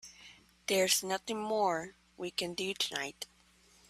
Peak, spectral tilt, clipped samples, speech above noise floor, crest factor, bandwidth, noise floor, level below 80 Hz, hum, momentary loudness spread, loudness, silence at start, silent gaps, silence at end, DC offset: -14 dBFS; -2 dB/octave; under 0.1%; 31 dB; 22 dB; 15.5 kHz; -65 dBFS; -72 dBFS; none; 18 LU; -33 LUFS; 0.05 s; none; 0.65 s; under 0.1%